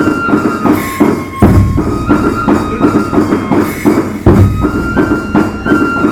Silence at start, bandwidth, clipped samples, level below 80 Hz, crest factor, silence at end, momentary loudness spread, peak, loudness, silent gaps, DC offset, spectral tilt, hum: 0 s; 18 kHz; 0.7%; -22 dBFS; 10 dB; 0 s; 4 LU; 0 dBFS; -11 LUFS; none; under 0.1%; -7.5 dB/octave; none